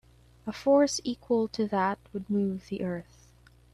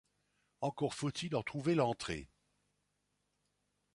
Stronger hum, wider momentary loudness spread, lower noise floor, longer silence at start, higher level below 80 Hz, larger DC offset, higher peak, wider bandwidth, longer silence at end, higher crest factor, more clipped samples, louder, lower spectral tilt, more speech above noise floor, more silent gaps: second, none vs 50 Hz at -65 dBFS; first, 14 LU vs 9 LU; second, -58 dBFS vs -82 dBFS; second, 0.45 s vs 0.6 s; first, -60 dBFS vs -66 dBFS; neither; first, -12 dBFS vs -18 dBFS; first, 13 kHz vs 11.5 kHz; second, 0.7 s vs 1.7 s; about the same, 18 dB vs 22 dB; neither; first, -29 LUFS vs -37 LUFS; about the same, -5 dB/octave vs -5.5 dB/octave; second, 30 dB vs 46 dB; neither